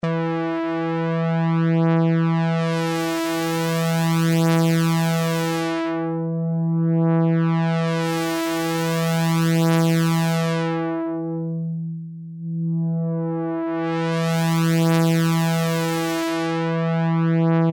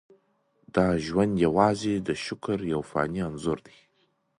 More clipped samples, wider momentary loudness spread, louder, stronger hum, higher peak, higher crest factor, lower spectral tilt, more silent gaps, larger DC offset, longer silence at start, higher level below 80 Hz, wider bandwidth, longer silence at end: neither; about the same, 7 LU vs 9 LU; first, -21 LUFS vs -27 LUFS; neither; second, -10 dBFS vs -6 dBFS; second, 10 dB vs 22 dB; about the same, -6.5 dB/octave vs -6.5 dB/octave; neither; neither; second, 0.05 s vs 0.75 s; second, -64 dBFS vs -52 dBFS; first, 17.5 kHz vs 11 kHz; second, 0 s vs 0.8 s